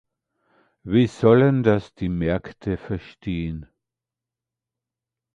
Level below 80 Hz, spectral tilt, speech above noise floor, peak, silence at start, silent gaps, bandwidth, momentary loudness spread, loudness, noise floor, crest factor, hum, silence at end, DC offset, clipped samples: -44 dBFS; -8.5 dB/octave; 67 dB; -4 dBFS; 0.85 s; none; 9 kHz; 15 LU; -22 LUFS; -88 dBFS; 20 dB; none; 1.7 s; under 0.1%; under 0.1%